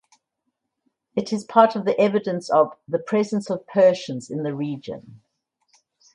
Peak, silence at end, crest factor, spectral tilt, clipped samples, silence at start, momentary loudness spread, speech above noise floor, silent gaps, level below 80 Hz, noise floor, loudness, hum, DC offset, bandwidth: 0 dBFS; 1 s; 22 dB; -6.5 dB/octave; under 0.1%; 1.15 s; 12 LU; 57 dB; none; -70 dBFS; -78 dBFS; -22 LUFS; none; under 0.1%; 10.5 kHz